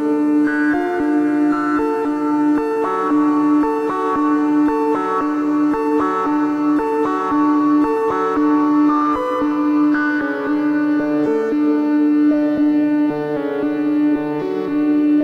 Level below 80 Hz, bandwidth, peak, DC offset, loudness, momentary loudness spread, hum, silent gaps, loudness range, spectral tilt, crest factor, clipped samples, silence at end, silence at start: -52 dBFS; 6.6 kHz; -6 dBFS; under 0.1%; -17 LUFS; 4 LU; none; none; 1 LU; -7 dB/octave; 10 dB; under 0.1%; 0 s; 0 s